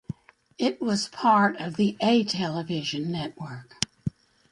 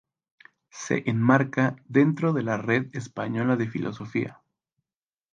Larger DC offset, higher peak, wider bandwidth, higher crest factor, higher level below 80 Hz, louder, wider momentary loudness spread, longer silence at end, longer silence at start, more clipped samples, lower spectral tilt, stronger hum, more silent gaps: neither; first, 0 dBFS vs -6 dBFS; first, 11.5 kHz vs 9 kHz; first, 26 dB vs 20 dB; first, -60 dBFS vs -66 dBFS; about the same, -26 LUFS vs -25 LUFS; first, 15 LU vs 12 LU; second, 0.45 s vs 1 s; second, 0.1 s vs 0.75 s; neither; second, -5 dB/octave vs -7 dB/octave; neither; neither